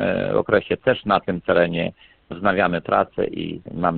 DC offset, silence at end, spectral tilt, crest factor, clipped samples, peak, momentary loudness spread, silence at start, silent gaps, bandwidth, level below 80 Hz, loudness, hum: under 0.1%; 0 s; -11 dB/octave; 20 dB; under 0.1%; 0 dBFS; 9 LU; 0 s; none; 4.5 kHz; -50 dBFS; -21 LUFS; none